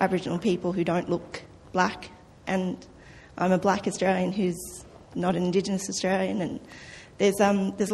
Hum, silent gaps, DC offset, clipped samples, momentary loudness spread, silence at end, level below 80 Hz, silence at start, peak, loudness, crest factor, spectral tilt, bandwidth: none; none; under 0.1%; under 0.1%; 17 LU; 0 s; -56 dBFS; 0 s; -6 dBFS; -27 LUFS; 20 dB; -5.5 dB/octave; 13 kHz